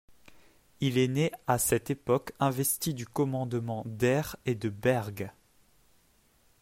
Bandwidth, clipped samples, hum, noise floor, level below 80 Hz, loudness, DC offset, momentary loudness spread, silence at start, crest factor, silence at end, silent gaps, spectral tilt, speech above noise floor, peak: 16 kHz; under 0.1%; none; -66 dBFS; -60 dBFS; -30 LUFS; under 0.1%; 7 LU; 0.8 s; 20 dB; 1.3 s; none; -5 dB/octave; 36 dB; -10 dBFS